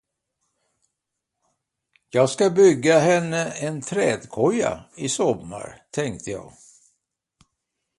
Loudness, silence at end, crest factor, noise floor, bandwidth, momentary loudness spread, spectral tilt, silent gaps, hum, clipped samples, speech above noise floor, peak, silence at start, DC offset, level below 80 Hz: -21 LUFS; 1.5 s; 20 dB; -82 dBFS; 11.5 kHz; 16 LU; -5 dB/octave; none; none; under 0.1%; 61 dB; -4 dBFS; 2.15 s; under 0.1%; -60 dBFS